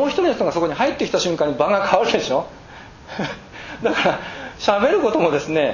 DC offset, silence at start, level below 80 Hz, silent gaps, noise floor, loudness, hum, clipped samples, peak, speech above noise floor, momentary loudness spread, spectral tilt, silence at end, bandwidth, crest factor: under 0.1%; 0 s; -50 dBFS; none; -40 dBFS; -19 LUFS; none; under 0.1%; -2 dBFS; 21 dB; 17 LU; -4.5 dB/octave; 0 s; 7.4 kHz; 18 dB